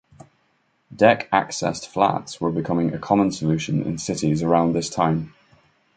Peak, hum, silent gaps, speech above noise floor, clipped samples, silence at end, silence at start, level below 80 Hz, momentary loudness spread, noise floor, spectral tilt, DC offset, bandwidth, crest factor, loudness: -2 dBFS; none; none; 45 dB; under 0.1%; 0.7 s; 0.9 s; -52 dBFS; 8 LU; -66 dBFS; -5.5 dB/octave; under 0.1%; 9.4 kHz; 20 dB; -21 LUFS